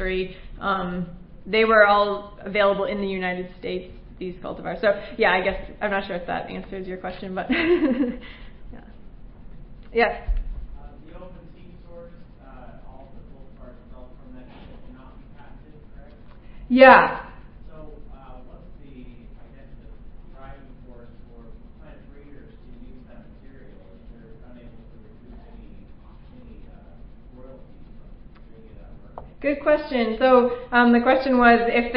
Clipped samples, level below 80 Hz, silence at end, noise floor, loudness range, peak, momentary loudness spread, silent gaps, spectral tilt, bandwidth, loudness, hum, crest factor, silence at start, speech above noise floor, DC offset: under 0.1%; -40 dBFS; 0 s; -44 dBFS; 22 LU; 0 dBFS; 28 LU; none; -9.5 dB/octave; 5.4 kHz; -21 LUFS; none; 24 dB; 0 s; 23 dB; under 0.1%